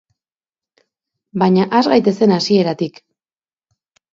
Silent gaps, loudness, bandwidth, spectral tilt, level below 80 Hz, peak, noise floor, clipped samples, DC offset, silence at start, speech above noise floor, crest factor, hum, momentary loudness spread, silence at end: none; -15 LUFS; 7.6 kHz; -6.5 dB/octave; -62 dBFS; 0 dBFS; under -90 dBFS; under 0.1%; under 0.1%; 1.35 s; over 76 dB; 16 dB; none; 11 LU; 1.25 s